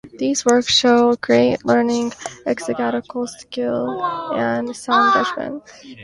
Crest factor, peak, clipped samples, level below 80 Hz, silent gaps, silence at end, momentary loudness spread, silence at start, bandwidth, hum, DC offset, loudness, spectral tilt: 18 dB; 0 dBFS; under 0.1%; -56 dBFS; none; 0 s; 13 LU; 0.05 s; 11.5 kHz; none; under 0.1%; -18 LUFS; -3.5 dB/octave